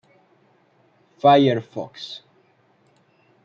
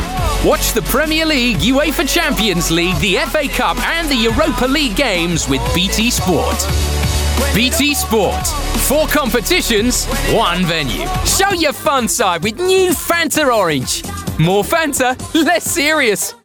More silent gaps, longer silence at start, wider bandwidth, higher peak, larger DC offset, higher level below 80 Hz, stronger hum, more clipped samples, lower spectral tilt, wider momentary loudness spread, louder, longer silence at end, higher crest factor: neither; first, 1.25 s vs 0 s; second, 7.2 kHz vs over 20 kHz; about the same, -4 dBFS vs -2 dBFS; neither; second, -72 dBFS vs -26 dBFS; neither; neither; first, -7 dB/octave vs -3.5 dB/octave; first, 20 LU vs 4 LU; second, -19 LUFS vs -14 LUFS; first, 1.25 s vs 0.1 s; first, 20 dB vs 12 dB